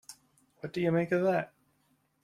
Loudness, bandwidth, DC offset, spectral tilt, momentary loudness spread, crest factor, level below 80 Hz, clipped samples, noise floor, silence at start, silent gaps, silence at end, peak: -30 LUFS; 14.5 kHz; under 0.1%; -7 dB/octave; 17 LU; 16 dB; -72 dBFS; under 0.1%; -72 dBFS; 0.1 s; none; 0.8 s; -16 dBFS